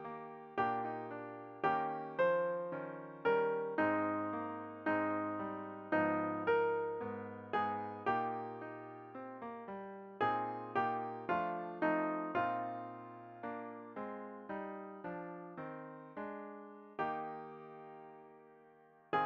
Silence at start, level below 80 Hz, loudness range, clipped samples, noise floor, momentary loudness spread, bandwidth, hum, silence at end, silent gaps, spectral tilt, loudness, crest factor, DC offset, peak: 0 s; -80 dBFS; 10 LU; under 0.1%; -64 dBFS; 15 LU; 6.2 kHz; none; 0 s; none; -8 dB/octave; -39 LUFS; 18 dB; under 0.1%; -22 dBFS